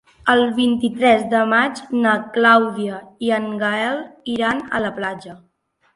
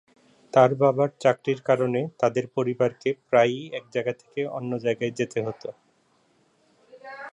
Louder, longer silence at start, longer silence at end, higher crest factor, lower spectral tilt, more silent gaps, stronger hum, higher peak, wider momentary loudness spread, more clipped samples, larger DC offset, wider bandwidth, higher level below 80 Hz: first, -18 LUFS vs -24 LUFS; second, 0.25 s vs 0.55 s; first, 0.6 s vs 0.05 s; about the same, 18 dB vs 20 dB; second, -5 dB/octave vs -6.5 dB/octave; neither; neither; first, 0 dBFS vs -4 dBFS; about the same, 12 LU vs 12 LU; neither; neither; about the same, 11.5 kHz vs 10.5 kHz; first, -58 dBFS vs -72 dBFS